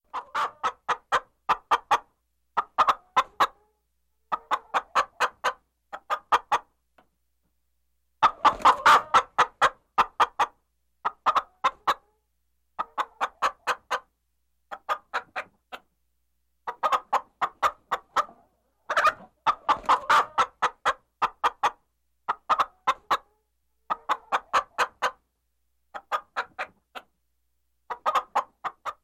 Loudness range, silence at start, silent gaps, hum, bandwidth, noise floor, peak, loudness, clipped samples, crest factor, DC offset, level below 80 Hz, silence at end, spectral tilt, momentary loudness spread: 10 LU; 0.15 s; none; none; 15.5 kHz; -76 dBFS; -8 dBFS; -26 LUFS; under 0.1%; 20 dB; under 0.1%; -62 dBFS; 0.1 s; -1.5 dB/octave; 15 LU